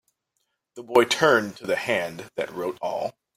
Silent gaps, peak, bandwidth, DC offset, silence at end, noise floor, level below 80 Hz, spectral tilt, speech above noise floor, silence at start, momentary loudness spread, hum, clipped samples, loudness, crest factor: none; -4 dBFS; 16 kHz; under 0.1%; 0.25 s; -77 dBFS; -68 dBFS; -3.5 dB/octave; 53 dB; 0.75 s; 13 LU; none; under 0.1%; -24 LUFS; 22 dB